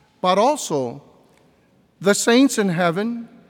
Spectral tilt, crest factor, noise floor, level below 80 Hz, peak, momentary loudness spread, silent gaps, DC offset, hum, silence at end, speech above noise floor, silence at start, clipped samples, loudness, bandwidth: -4 dB/octave; 16 dB; -58 dBFS; -70 dBFS; -6 dBFS; 10 LU; none; under 0.1%; none; 0.25 s; 39 dB; 0.25 s; under 0.1%; -19 LUFS; 17.5 kHz